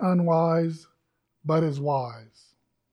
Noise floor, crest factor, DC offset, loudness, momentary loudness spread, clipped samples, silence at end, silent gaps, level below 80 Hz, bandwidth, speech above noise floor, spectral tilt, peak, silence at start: -75 dBFS; 16 dB; under 0.1%; -25 LUFS; 15 LU; under 0.1%; 0.7 s; none; -70 dBFS; 9.2 kHz; 51 dB; -9 dB/octave; -10 dBFS; 0 s